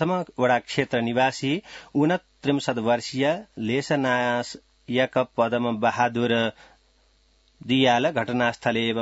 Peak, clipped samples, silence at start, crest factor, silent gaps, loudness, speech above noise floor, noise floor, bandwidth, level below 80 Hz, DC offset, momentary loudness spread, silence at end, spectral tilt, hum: -6 dBFS; under 0.1%; 0 s; 18 dB; none; -24 LUFS; 38 dB; -62 dBFS; 8 kHz; -62 dBFS; under 0.1%; 6 LU; 0 s; -5.5 dB/octave; none